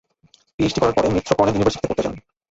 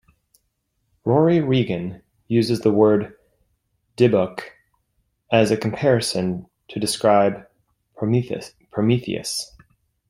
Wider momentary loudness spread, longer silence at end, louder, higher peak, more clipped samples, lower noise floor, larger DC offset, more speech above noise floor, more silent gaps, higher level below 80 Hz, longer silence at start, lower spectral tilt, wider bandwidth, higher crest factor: second, 8 LU vs 16 LU; second, 0.3 s vs 0.65 s; about the same, -20 LUFS vs -20 LUFS; about the same, -2 dBFS vs -2 dBFS; neither; second, -57 dBFS vs -72 dBFS; neither; second, 38 dB vs 53 dB; neither; first, -42 dBFS vs -58 dBFS; second, 0.6 s vs 1.05 s; about the same, -6 dB/octave vs -6 dB/octave; second, 8 kHz vs 16 kHz; about the same, 18 dB vs 20 dB